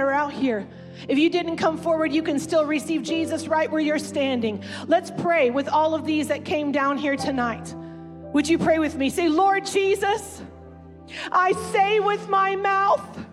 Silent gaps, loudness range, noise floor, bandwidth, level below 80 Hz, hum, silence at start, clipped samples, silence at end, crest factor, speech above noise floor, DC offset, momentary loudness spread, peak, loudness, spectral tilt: none; 1 LU; -43 dBFS; 13.5 kHz; -60 dBFS; none; 0 s; under 0.1%; 0 s; 14 dB; 21 dB; under 0.1%; 11 LU; -10 dBFS; -22 LUFS; -4.5 dB/octave